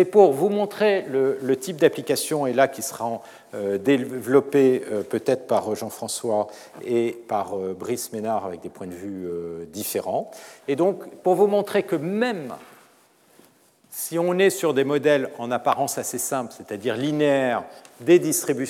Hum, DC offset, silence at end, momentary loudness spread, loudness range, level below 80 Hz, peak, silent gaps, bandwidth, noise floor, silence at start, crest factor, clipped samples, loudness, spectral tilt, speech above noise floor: none; under 0.1%; 0 s; 13 LU; 5 LU; -78 dBFS; -2 dBFS; none; 17.5 kHz; -57 dBFS; 0 s; 20 dB; under 0.1%; -23 LUFS; -4.5 dB/octave; 35 dB